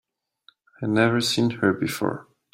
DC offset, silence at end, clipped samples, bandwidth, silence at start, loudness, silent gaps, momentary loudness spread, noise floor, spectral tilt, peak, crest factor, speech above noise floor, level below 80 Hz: under 0.1%; 0.3 s; under 0.1%; 16 kHz; 0.8 s; -23 LUFS; none; 10 LU; -60 dBFS; -5 dB/octave; -6 dBFS; 20 dB; 37 dB; -64 dBFS